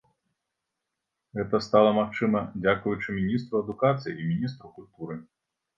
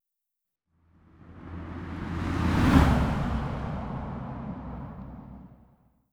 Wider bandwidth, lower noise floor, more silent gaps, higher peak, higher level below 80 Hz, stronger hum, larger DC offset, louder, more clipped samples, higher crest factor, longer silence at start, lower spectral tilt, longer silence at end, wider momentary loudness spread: second, 7.4 kHz vs 16.5 kHz; about the same, -84 dBFS vs -86 dBFS; neither; about the same, -6 dBFS vs -6 dBFS; second, -58 dBFS vs -36 dBFS; neither; neither; about the same, -26 LUFS vs -28 LUFS; neither; about the same, 22 dB vs 24 dB; about the same, 1.35 s vs 1.25 s; about the same, -7.5 dB/octave vs -7.5 dB/octave; about the same, 0.55 s vs 0.65 s; second, 18 LU vs 22 LU